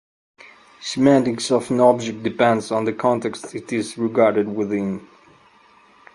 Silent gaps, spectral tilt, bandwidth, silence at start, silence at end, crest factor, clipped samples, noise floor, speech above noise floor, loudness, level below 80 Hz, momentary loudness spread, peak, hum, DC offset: none; -5.5 dB/octave; 11.5 kHz; 0.45 s; 1.1 s; 20 dB; under 0.1%; -52 dBFS; 33 dB; -20 LUFS; -62 dBFS; 12 LU; 0 dBFS; none; under 0.1%